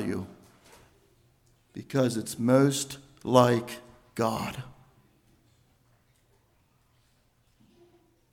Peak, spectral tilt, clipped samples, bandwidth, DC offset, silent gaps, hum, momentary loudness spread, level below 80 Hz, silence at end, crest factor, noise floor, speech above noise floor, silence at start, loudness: -6 dBFS; -5.5 dB/octave; under 0.1%; 17.5 kHz; under 0.1%; none; none; 23 LU; -64 dBFS; 3.65 s; 26 dB; -67 dBFS; 41 dB; 0 s; -27 LUFS